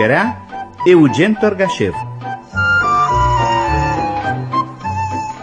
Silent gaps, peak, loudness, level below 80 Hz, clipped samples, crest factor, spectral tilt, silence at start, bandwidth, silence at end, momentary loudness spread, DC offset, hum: none; 0 dBFS; -15 LUFS; -32 dBFS; under 0.1%; 14 dB; -6.5 dB/octave; 0 s; 9.8 kHz; 0 s; 12 LU; under 0.1%; none